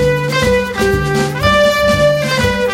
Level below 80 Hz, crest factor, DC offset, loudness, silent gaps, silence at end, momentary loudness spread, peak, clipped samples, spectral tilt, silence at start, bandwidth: -28 dBFS; 12 dB; under 0.1%; -13 LUFS; none; 0 s; 4 LU; 0 dBFS; under 0.1%; -5 dB/octave; 0 s; 16.5 kHz